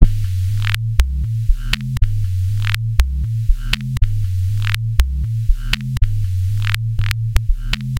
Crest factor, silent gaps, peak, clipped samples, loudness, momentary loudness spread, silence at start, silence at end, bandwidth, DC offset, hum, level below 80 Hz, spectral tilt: 16 dB; none; 0 dBFS; 0.2%; -20 LUFS; 2 LU; 0 s; 0 s; 17 kHz; under 0.1%; none; -20 dBFS; -5 dB/octave